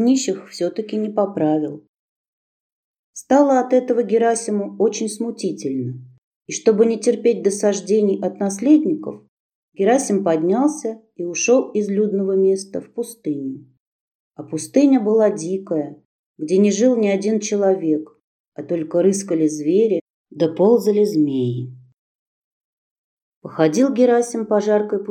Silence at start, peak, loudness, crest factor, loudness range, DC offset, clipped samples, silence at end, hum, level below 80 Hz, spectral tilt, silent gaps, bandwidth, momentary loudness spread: 0 s; -2 dBFS; -19 LUFS; 18 dB; 3 LU; under 0.1%; under 0.1%; 0 s; none; -76 dBFS; -5.5 dB/octave; 1.89-3.13 s, 6.18-6.41 s, 9.28-9.72 s, 13.80-14.31 s, 16.05-16.34 s, 18.24-18.52 s, 20.01-20.25 s, 21.93-23.42 s; 14.5 kHz; 14 LU